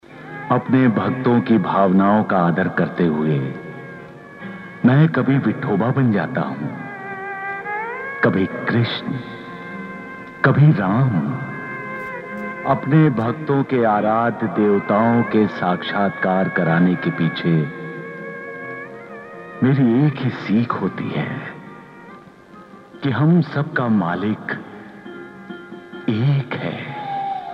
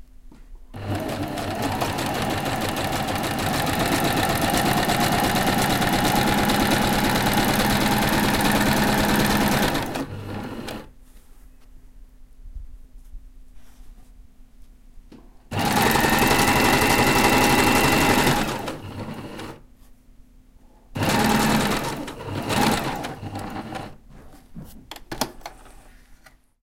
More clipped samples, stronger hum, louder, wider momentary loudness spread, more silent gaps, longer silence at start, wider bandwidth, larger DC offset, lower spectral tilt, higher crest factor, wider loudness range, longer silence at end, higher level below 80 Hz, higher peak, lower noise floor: neither; neither; about the same, -19 LUFS vs -21 LUFS; about the same, 19 LU vs 17 LU; neither; about the same, 0.1 s vs 0 s; second, 5.8 kHz vs 17 kHz; neither; first, -9.5 dB/octave vs -4 dB/octave; about the same, 18 dB vs 18 dB; second, 5 LU vs 13 LU; second, 0 s vs 0.5 s; second, -60 dBFS vs -38 dBFS; about the same, -2 dBFS vs -4 dBFS; second, -43 dBFS vs -51 dBFS